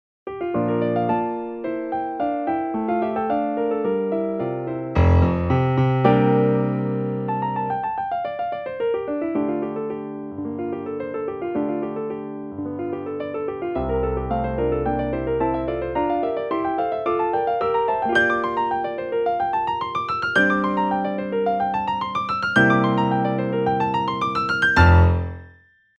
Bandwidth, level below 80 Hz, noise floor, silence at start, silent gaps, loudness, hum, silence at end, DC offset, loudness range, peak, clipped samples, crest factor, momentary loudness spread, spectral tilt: 8.8 kHz; -36 dBFS; -52 dBFS; 0.25 s; none; -22 LUFS; none; 0.5 s; under 0.1%; 7 LU; -2 dBFS; under 0.1%; 20 dB; 11 LU; -8 dB/octave